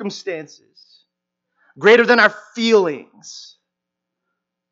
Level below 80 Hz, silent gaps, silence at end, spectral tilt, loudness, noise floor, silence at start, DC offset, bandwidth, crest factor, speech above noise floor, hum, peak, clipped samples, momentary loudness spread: -78 dBFS; none; 1.3 s; -4 dB/octave; -15 LUFS; -81 dBFS; 0 s; under 0.1%; 7.6 kHz; 20 dB; 65 dB; none; 0 dBFS; under 0.1%; 25 LU